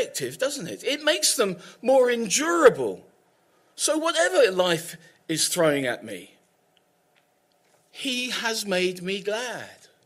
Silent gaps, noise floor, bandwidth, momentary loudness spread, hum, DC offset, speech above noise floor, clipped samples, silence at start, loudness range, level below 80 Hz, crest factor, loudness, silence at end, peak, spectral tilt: none; -66 dBFS; 16 kHz; 14 LU; none; under 0.1%; 42 dB; under 0.1%; 0 s; 7 LU; -72 dBFS; 22 dB; -23 LUFS; 0.35 s; -4 dBFS; -2.5 dB/octave